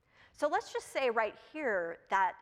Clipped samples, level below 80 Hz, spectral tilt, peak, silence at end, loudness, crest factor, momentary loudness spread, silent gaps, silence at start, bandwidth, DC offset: under 0.1%; -74 dBFS; -3 dB/octave; -16 dBFS; 0.05 s; -34 LUFS; 18 dB; 6 LU; none; 0.4 s; 15 kHz; under 0.1%